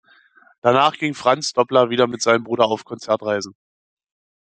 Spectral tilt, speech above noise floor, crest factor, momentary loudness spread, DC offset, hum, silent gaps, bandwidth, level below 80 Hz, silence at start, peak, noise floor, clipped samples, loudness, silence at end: -4 dB/octave; 34 dB; 18 dB; 8 LU; under 0.1%; none; none; 9.4 kHz; -66 dBFS; 0.65 s; -2 dBFS; -53 dBFS; under 0.1%; -19 LUFS; 0.9 s